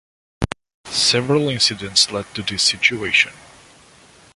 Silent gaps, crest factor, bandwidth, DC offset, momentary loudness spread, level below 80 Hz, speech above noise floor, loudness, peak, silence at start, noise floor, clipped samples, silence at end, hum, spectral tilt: 0.74-0.84 s; 20 dB; 11.5 kHz; under 0.1%; 12 LU; -44 dBFS; 29 dB; -17 LUFS; 0 dBFS; 0.4 s; -49 dBFS; under 0.1%; 1 s; none; -2.5 dB/octave